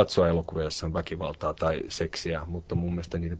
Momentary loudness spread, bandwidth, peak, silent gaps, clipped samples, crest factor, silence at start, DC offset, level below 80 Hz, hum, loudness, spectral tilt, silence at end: 7 LU; 9 kHz; -6 dBFS; none; under 0.1%; 22 dB; 0 s; under 0.1%; -44 dBFS; none; -30 LUFS; -6 dB/octave; 0 s